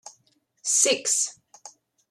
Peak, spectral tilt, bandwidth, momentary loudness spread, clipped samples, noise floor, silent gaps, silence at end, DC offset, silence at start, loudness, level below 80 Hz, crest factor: -6 dBFS; 1 dB/octave; 16 kHz; 10 LU; under 0.1%; -67 dBFS; none; 0.4 s; under 0.1%; 0.05 s; -22 LUFS; -82 dBFS; 22 dB